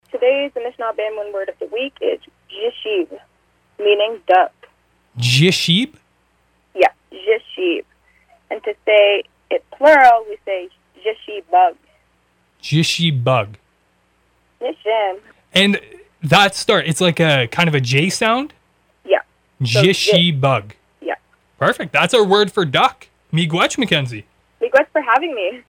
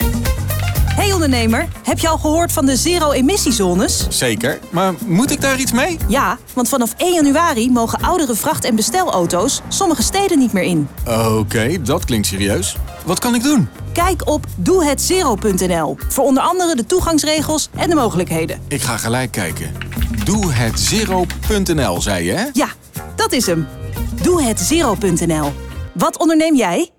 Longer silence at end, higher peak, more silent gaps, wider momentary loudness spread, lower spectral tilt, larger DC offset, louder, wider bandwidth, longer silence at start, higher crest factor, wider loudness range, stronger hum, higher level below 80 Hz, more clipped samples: about the same, 0.1 s vs 0.1 s; first, -2 dBFS vs -6 dBFS; neither; first, 14 LU vs 6 LU; about the same, -4.5 dB/octave vs -4.5 dB/octave; neither; about the same, -16 LUFS vs -16 LUFS; second, 16.5 kHz vs 19 kHz; first, 0.15 s vs 0 s; first, 16 dB vs 10 dB; about the same, 5 LU vs 3 LU; neither; second, -58 dBFS vs -28 dBFS; neither